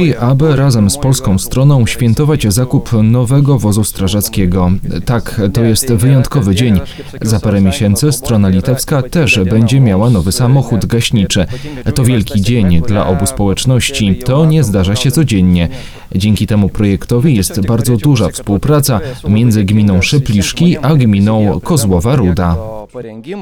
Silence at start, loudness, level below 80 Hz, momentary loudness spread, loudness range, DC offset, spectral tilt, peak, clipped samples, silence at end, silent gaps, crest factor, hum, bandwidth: 0 s; -11 LUFS; -28 dBFS; 5 LU; 2 LU; under 0.1%; -6 dB/octave; 0 dBFS; 0.1%; 0 s; none; 10 dB; none; 18.5 kHz